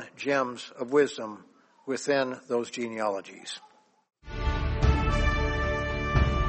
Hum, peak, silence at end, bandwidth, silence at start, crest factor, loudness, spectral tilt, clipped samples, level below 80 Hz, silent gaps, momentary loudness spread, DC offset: none; -10 dBFS; 0 s; 8.4 kHz; 0 s; 18 dB; -29 LUFS; -6 dB/octave; under 0.1%; -34 dBFS; none; 14 LU; under 0.1%